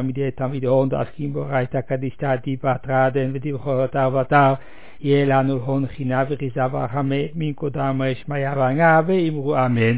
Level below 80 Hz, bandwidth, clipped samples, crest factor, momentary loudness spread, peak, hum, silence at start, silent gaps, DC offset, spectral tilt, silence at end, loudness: -52 dBFS; 4 kHz; under 0.1%; 18 dB; 9 LU; -2 dBFS; none; 0 s; none; 2%; -11.5 dB/octave; 0 s; -21 LUFS